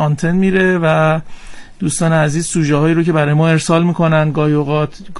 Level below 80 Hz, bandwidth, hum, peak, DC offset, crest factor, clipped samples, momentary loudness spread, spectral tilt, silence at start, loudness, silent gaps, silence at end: -38 dBFS; 11.5 kHz; none; -2 dBFS; under 0.1%; 12 dB; under 0.1%; 5 LU; -6 dB/octave; 0 s; -14 LUFS; none; 0 s